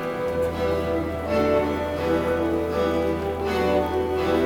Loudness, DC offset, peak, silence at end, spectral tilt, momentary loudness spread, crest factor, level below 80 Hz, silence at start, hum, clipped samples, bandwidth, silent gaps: -24 LUFS; under 0.1%; -10 dBFS; 0 s; -6.5 dB/octave; 4 LU; 14 dB; -40 dBFS; 0 s; none; under 0.1%; 18 kHz; none